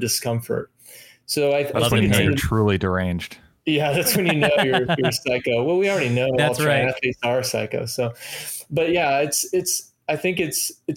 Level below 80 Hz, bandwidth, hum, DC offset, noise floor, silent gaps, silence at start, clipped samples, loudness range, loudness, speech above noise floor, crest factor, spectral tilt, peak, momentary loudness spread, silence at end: -46 dBFS; 17 kHz; none; under 0.1%; -46 dBFS; none; 0 s; under 0.1%; 3 LU; -21 LUFS; 26 dB; 18 dB; -4 dB/octave; -2 dBFS; 9 LU; 0 s